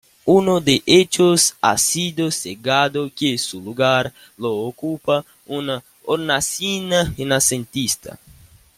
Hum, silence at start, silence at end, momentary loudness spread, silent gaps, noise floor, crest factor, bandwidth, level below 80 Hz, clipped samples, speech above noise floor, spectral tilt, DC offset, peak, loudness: none; 0.25 s; 0.6 s; 12 LU; none; -48 dBFS; 18 dB; 16.5 kHz; -50 dBFS; under 0.1%; 29 dB; -3.5 dB/octave; under 0.1%; -2 dBFS; -18 LUFS